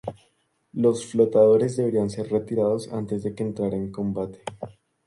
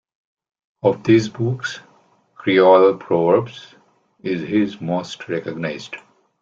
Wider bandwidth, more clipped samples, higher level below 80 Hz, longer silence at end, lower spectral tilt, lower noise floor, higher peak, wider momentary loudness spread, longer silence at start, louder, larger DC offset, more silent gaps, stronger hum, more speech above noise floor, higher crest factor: first, 11.5 kHz vs 7.6 kHz; neither; about the same, -58 dBFS vs -60 dBFS; about the same, 0.4 s vs 0.45 s; about the same, -7.5 dB/octave vs -6.5 dB/octave; first, -68 dBFS vs -56 dBFS; second, -6 dBFS vs -2 dBFS; about the same, 19 LU vs 19 LU; second, 0.05 s vs 0.85 s; second, -24 LUFS vs -18 LUFS; neither; neither; neither; first, 45 dB vs 38 dB; about the same, 18 dB vs 18 dB